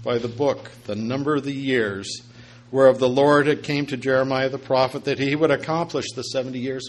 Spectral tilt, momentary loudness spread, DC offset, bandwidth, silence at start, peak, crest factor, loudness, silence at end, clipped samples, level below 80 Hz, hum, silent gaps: -5.5 dB/octave; 11 LU; under 0.1%; 11.5 kHz; 0 s; -2 dBFS; 20 dB; -22 LUFS; 0 s; under 0.1%; -60 dBFS; none; none